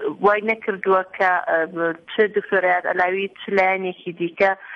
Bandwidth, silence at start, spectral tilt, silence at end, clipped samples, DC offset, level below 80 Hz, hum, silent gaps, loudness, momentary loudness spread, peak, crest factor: 7 kHz; 0 s; -6.5 dB/octave; 0 s; under 0.1%; under 0.1%; -64 dBFS; none; none; -20 LUFS; 6 LU; -4 dBFS; 16 dB